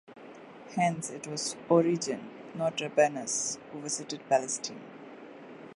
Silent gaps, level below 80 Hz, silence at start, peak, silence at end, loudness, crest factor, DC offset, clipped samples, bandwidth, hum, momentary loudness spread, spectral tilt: none; -78 dBFS; 0.1 s; -10 dBFS; 0 s; -30 LUFS; 22 dB; under 0.1%; under 0.1%; 11.5 kHz; none; 21 LU; -3.5 dB/octave